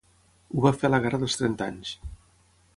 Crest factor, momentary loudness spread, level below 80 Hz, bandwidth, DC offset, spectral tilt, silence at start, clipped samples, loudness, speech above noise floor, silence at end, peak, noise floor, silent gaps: 22 dB; 15 LU; -50 dBFS; 11.5 kHz; under 0.1%; -5.5 dB/octave; 0.5 s; under 0.1%; -26 LUFS; 36 dB; 0.6 s; -6 dBFS; -61 dBFS; none